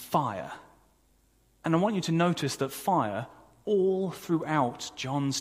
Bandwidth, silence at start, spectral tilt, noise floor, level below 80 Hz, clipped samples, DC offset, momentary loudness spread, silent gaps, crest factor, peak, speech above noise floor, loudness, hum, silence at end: 15.5 kHz; 0 s; -5.5 dB/octave; -65 dBFS; -66 dBFS; under 0.1%; under 0.1%; 12 LU; none; 18 dB; -10 dBFS; 37 dB; -29 LUFS; none; 0 s